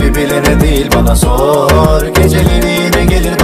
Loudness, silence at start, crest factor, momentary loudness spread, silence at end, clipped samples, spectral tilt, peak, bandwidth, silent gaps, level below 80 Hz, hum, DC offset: -10 LUFS; 0 s; 8 dB; 2 LU; 0 s; under 0.1%; -5.5 dB/octave; 0 dBFS; 16 kHz; none; -14 dBFS; none; under 0.1%